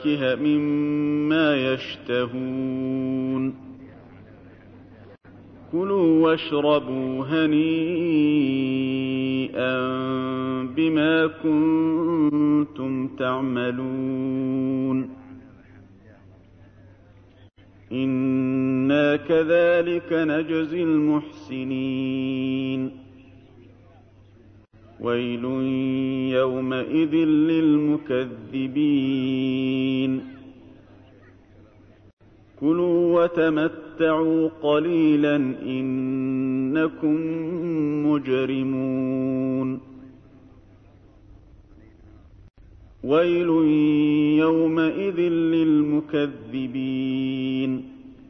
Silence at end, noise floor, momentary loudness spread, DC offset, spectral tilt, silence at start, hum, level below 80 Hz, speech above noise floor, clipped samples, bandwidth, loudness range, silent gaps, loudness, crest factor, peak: 0.15 s; -51 dBFS; 8 LU; under 0.1%; -9 dB/octave; 0 s; none; -60 dBFS; 29 dB; under 0.1%; 5.8 kHz; 9 LU; 32.13-32.17 s; -23 LUFS; 14 dB; -8 dBFS